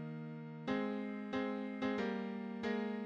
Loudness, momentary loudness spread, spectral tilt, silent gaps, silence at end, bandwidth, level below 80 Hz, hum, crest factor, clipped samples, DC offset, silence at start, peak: -41 LUFS; 7 LU; -7 dB/octave; none; 0 s; 7.4 kHz; -74 dBFS; none; 16 dB; under 0.1%; under 0.1%; 0 s; -26 dBFS